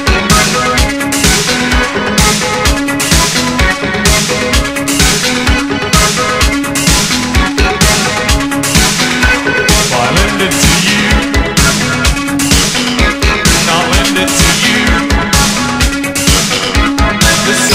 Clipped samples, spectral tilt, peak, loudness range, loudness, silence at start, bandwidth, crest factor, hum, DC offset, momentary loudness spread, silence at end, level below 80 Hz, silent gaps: 0.2%; -3 dB/octave; 0 dBFS; 1 LU; -9 LUFS; 0 s; 16.5 kHz; 10 dB; none; under 0.1%; 3 LU; 0 s; -18 dBFS; none